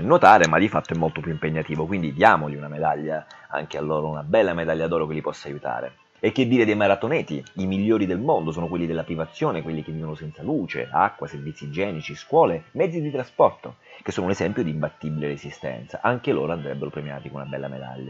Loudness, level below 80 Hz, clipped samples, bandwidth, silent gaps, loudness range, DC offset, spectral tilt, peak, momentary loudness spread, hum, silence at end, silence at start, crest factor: -23 LUFS; -54 dBFS; under 0.1%; 8 kHz; none; 4 LU; under 0.1%; -6.5 dB/octave; 0 dBFS; 14 LU; none; 0 s; 0 s; 22 dB